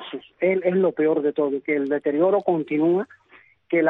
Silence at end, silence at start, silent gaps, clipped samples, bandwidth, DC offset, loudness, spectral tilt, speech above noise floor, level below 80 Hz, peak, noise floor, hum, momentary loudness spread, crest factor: 0 s; 0 s; none; under 0.1%; 4 kHz; under 0.1%; -22 LUFS; -10 dB/octave; 33 dB; -72 dBFS; -6 dBFS; -54 dBFS; none; 5 LU; 16 dB